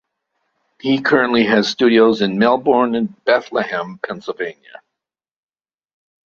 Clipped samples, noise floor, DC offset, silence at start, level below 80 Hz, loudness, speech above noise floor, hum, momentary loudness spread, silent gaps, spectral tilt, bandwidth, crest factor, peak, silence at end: under 0.1%; -84 dBFS; under 0.1%; 0.85 s; -58 dBFS; -16 LUFS; 68 dB; none; 13 LU; none; -5.5 dB/octave; 7.2 kHz; 16 dB; -2 dBFS; 1.75 s